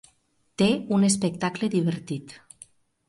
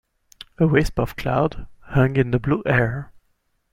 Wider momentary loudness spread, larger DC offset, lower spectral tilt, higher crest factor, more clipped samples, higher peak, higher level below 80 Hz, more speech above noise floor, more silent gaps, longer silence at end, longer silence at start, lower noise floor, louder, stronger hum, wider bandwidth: first, 20 LU vs 7 LU; neither; second, -5 dB/octave vs -7.5 dB/octave; about the same, 18 dB vs 18 dB; neither; second, -8 dBFS vs -4 dBFS; second, -64 dBFS vs -38 dBFS; second, 42 dB vs 48 dB; neither; about the same, 0.75 s vs 0.65 s; about the same, 0.6 s vs 0.6 s; about the same, -66 dBFS vs -67 dBFS; second, -25 LUFS vs -21 LUFS; neither; second, 11.5 kHz vs 15.5 kHz